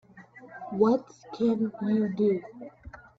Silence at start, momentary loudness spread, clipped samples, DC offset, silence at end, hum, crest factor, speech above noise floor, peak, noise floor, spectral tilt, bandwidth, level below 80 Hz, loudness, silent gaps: 0.15 s; 21 LU; under 0.1%; under 0.1%; 0.2 s; none; 18 dB; 24 dB; -10 dBFS; -51 dBFS; -8.5 dB/octave; 6.6 kHz; -62 dBFS; -27 LUFS; none